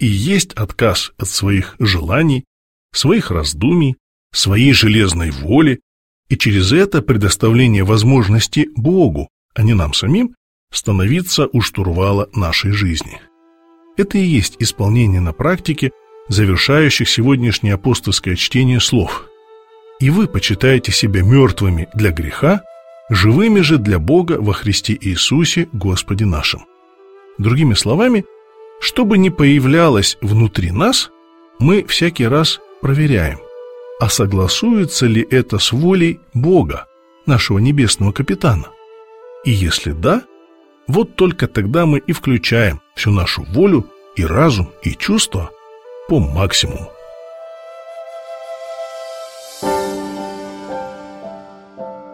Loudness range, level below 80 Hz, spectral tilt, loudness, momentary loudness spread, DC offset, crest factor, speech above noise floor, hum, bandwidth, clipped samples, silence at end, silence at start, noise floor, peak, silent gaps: 5 LU; -32 dBFS; -5 dB/octave; -14 LUFS; 16 LU; 0.2%; 14 dB; 37 dB; none; 16.5 kHz; under 0.1%; 0 s; 0 s; -50 dBFS; 0 dBFS; 2.47-2.89 s, 4.00-4.30 s, 5.82-6.23 s, 9.30-9.49 s, 10.37-10.67 s